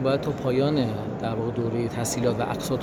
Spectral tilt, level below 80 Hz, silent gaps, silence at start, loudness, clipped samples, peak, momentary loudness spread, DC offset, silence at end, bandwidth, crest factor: -6 dB/octave; -50 dBFS; none; 0 s; -26 LUFS; under 0.1%; -10 dBFS; 5 LU; under 0.1%; 0 s; 19 kHz; 16 dB